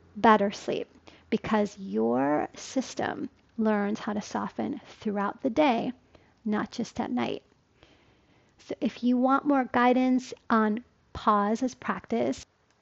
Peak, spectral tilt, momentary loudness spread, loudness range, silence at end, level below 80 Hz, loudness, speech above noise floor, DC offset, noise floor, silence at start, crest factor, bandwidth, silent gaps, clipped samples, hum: -6 dBFS; -5.5 dB/octave; 12 LU; 5 LU; 0.4 s; -62 dBFS; -28 LUFS; 35 dB; under 0.1%; -62 dBFS; 0.15 s; 22 dB; 8 kHz; none; under 0.1%; none